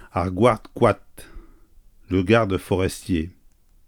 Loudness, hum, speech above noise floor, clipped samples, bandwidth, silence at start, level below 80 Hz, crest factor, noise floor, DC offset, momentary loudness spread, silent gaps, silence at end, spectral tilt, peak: -22 LUFS; none; 33 dB; under 0.1%; 19 kHz; 0.15 s; -44 dBFS; 20 dB; -54 dBFS; under 0.1%; 8 LU; none; 0.55 s; -6.5 dB/octave; -4 dBFS